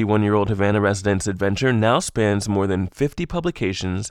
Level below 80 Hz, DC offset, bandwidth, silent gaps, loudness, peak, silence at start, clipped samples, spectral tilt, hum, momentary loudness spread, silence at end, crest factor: -42 dBFS; under 0.1%; 13 kHz; none; -21 LUFS; -4 dBFS; 0 s; under 0.1%; -5.5 dB/octave; none; 6 LU; 0 s; 16 dB